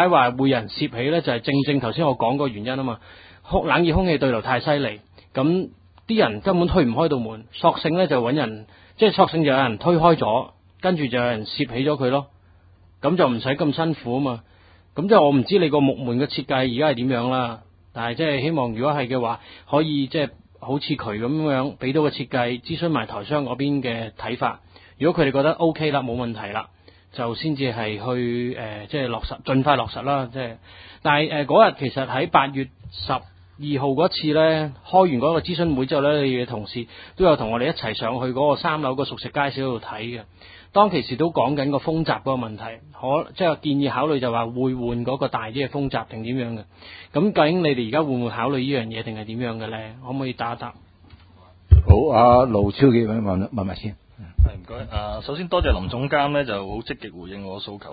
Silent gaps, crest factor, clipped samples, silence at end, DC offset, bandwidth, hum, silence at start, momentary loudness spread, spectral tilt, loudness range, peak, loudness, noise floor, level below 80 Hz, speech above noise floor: none; 22 dB; under 0.1%; 0 s; under 0.1%; 5 kHz; none; 0 s; 14 LU; -11.5 dB/octave; 5 LU; 0 dBFS; -22 LUFS; -52 dBFS; -34 dBFS; 31 dB